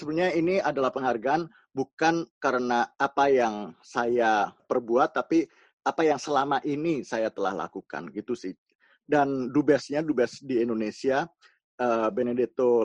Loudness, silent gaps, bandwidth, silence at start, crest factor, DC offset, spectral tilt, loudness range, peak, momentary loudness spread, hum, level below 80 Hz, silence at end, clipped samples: -27 LUFS; 1.93-1.97 s, 2.31-2.41 s, 5.73-5.78 s, 8.58-8.66 s, 8.75-8.79 s, 11.64-11.78 s; 9.4 kHz; 0 s; 18 dB; under 0.1%; -5.5 dB/octave; 3 LU; -8 dBFS; 11 LU; none; -68 dBFS; 0 s; under 0.1%